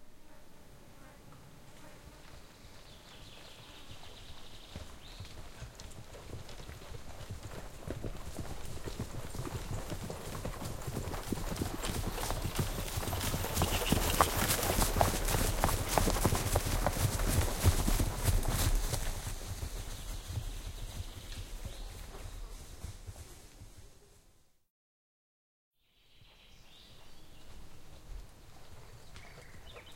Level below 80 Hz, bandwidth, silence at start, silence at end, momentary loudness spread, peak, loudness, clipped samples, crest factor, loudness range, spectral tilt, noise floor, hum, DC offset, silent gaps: -42 dBFS; 16.5 kHz; 0 s; 0 s; 24 LU; -6 dBFS; -35 LUFS; under 0.1%; 30 dB; 23 LU; -4 dB/octave; -65 dBFS; none; under 0.1%; 24.70-25.71 s